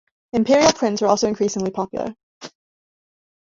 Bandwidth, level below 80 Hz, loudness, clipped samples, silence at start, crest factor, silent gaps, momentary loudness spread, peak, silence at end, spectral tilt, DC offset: 7.8 kHz; -56 dBFS; -19 LUFS; under 0.1%; 0.35 s; 20 dB; 2.23-2.41 s; 25 LU; -2 dBFS; 1.05 s; -4 dB/octave; under 0.1%